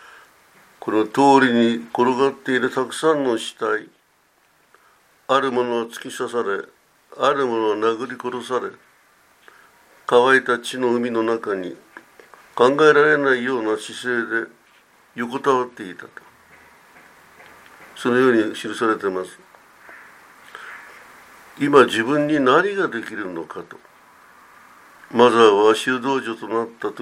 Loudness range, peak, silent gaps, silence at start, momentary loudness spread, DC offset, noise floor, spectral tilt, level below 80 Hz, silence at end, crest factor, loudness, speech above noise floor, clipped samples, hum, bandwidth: 7 LU; 0 dBFS; none; 0.8 s; 20 LU; under 0.1%; -60 dBFS; -4.5 dB/octave; -72 dBFS; 0 s; 20 dB; -19 LUFS; 41 dB; under 0.1%; none; 15 kHz